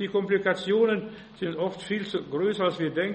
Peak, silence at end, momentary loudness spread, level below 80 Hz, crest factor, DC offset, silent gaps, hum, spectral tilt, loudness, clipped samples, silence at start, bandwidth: -10 dBFS; 0 s; 8 LU; -66 dBFS; 16 dB; under 0.1%; none; none; -6 dB/octave; -27 LUFS; under 0.1%; 0 s; 8.4 kHz